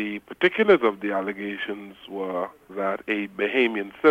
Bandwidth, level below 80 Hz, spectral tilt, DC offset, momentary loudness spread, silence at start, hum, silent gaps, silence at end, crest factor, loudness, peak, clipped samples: 7.4 kHz; -66 dBFS; -6.5 dB/octave; under 0.1%; 14 LU; 0 s; none; none; 0 s; 20 dB; -24 LUFS; -4 dBFS; under 0.1%